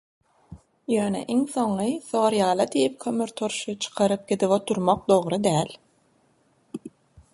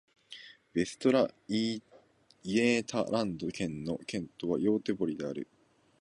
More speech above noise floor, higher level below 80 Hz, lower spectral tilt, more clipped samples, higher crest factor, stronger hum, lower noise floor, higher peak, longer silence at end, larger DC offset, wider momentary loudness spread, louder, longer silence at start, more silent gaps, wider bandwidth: first, 41 dB vs 31 dB; about the same, -62 dBFS vs -66 dBFS; about the same, -5 dB/octave vs -5.5 dB/octave; neither; about the same, 20 dB vs 18 dB; neither; about the same, -64 dBFS vs -62 dBFS; first, -6 dBFS vs -14 dBFS; about the same, 0.45 s vs 0.55 s; neither; second, 11 LU vs 18 LU; first, -24 LUFS vs -32 LUFS; first, 0.5 s vs 0.3 s; neither; about the same, 11.5 kHz vs 11 kHz